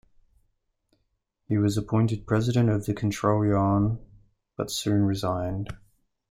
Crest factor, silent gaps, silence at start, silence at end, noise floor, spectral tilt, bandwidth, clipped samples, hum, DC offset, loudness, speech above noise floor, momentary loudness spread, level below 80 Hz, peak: 18 dB; none; 1.5 s; 0.55 s; -75 dBFS; -7 dB/octave; 15.5 kHz; under 0.1%; none; under 0.1%; -26 LUFS; 51 dB; 12 LU; -50 dBFS; -10 dBFS